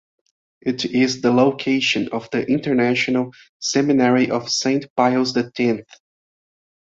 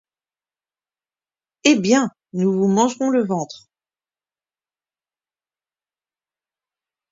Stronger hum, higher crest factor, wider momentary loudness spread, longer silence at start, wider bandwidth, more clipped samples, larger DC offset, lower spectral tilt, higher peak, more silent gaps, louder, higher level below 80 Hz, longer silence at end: neither; second, 18 dB vs 24 dB; about the same, 8 LU vs 9 LU; second, 0.65 s vs 1.65 s; about the same, 7.8 kHz vs 7.8 kHz; neither; neither; about the same, -4.5 dB/octave vs -5 dB/octave; about the same, -2 dBFS vs 0 dBFS; first, 3.49-3.60 s, 4.90-4.96 s vs none; about the same, -19 LUFS vs -19 LUFS; first, -62 dBFS vs -68 dBFS; second, 1.05 s vs 3.55 s